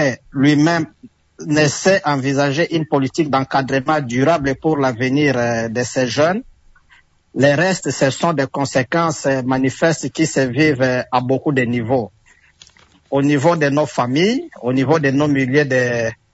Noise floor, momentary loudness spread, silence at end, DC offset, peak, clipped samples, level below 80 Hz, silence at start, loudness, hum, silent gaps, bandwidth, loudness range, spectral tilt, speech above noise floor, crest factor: -53 dBFS; 5 LU; 0.2 s; under 0.1%; -2 dBFS; under 0.1%; -52 dBFS; 0 s; -17 LUFS; none; none; 8 kHz; 2 LU; -5.5 dB/octave; 36 dB; 14 dB